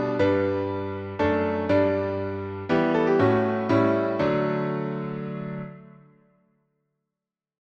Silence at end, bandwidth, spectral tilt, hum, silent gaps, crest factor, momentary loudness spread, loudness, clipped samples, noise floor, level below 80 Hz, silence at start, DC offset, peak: 1.9 s; 7.2 kHz; -8.5 dB/octave; none; none; 16 dB; 11 LU; -24 LUFS; under 0.1%; -88 dBFS; -58 dBFS; 0 s; under 0.1%; -8 dBFS